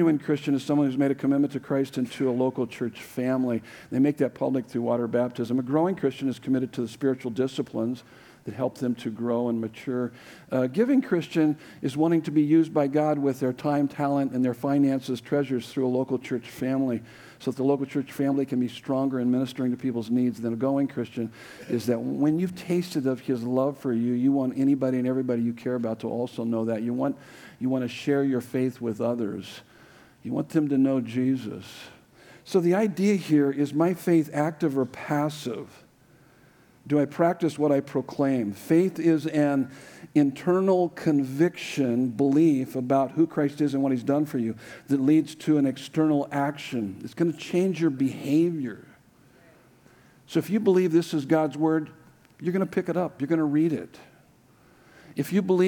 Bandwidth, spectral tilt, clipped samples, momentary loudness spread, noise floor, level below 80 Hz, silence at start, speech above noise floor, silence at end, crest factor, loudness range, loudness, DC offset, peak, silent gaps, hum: 18.5 kHz; -7.5 dB/octave; under 0.1%; 9 LU; -58 dBFS; -72 dBFS; 0 s; 33 dB; 0 s; 16 dB; 4 LU; -26 LUFS; under 0.1%; -8 dBFS; none; none